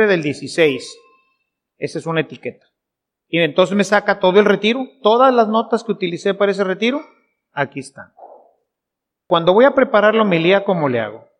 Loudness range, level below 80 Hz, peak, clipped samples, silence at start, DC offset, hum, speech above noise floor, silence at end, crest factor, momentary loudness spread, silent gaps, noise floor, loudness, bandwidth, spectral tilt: 7 LU; -64 dBFS; 0 dBFS; under 0.1%; 0 s; under 0.1%; none; 66 dB; 0.25 s; 16 dB; 15 LU; none; -82 dBFS; -16 LUFS; 11.5 kHz; -5.5 dB/octave